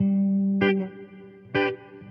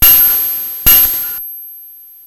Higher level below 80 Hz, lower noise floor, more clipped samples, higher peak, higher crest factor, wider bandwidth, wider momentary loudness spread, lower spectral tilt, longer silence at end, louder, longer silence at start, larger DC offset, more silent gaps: second, -66 dBFS vs -30 dBFS; first, -46 dBFS vs -36 dBFS; second, under 0.1% vs 0.5%; second, -10 dBFS vs 0 dBFS; about the same, 16 dB vs 12 dB; second, 5.4 kHz vs over 20 kHz; about the same, 19 LU vs 20 LU; first, -9.5 dB/octave vs -1 dB/octave; second, 0 s vs 0.35 s; second, -24 LUFS vs -8 LUFS; about the same, 0 s vs 0 s; neither; neither